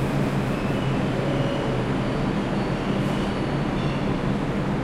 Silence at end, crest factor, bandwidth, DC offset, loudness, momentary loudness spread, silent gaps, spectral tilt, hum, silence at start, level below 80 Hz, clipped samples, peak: 0 s; 12 dB; 13.5 kHz; under 0.1%; -25 LUFS; 1 LU; none; -7 dB/octave; none; 0 s; -38 dBFS; under 0.1%; -12 dBFS